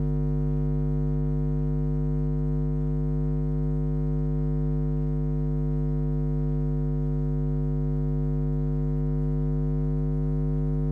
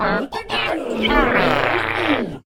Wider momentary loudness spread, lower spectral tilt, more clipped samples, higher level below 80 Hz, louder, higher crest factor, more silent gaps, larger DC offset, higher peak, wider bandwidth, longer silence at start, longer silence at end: second, 1 LU vs 6 LU; first, -12.5 dB/octave vs -5.5 dB/octave; neither; about the same, -30 dBFS vs -34 dBFS; second, -27 LUFS vs -19 LUFS; second, 8 dB vs 20 dB; neither; neither; second, -18 dBFS vs 0 dBFS; second, 2.3 kHz vs 18.5 kHz; about the same, 0 s vs 0 s; about the same, 0 s vs 0.05 s